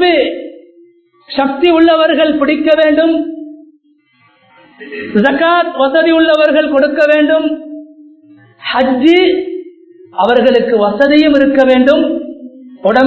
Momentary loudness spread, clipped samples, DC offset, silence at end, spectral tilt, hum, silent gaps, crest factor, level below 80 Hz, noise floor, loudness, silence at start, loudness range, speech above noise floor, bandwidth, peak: 17 LU; 0.2%; under 0.1%; 0 s; -6.5 dB/octave; none; none; 12 dB; -48 dBFS; -52 dBFS; -10 LUFS; 0 s; 4 LU; 43 dB; 8 kHz; 0 dBFS